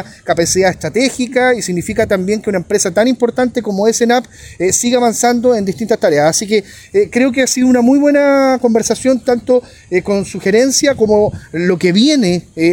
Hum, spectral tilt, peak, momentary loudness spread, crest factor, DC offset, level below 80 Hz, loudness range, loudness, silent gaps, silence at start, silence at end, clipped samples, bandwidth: none; -4 dB/octave; 0 dBFS; 6 LU; 12 dB; under 0.1%; -44 dBFS; 2 LU; -13 LUFS; none; 0 s; 0 s; under 0.1%; 17 kHz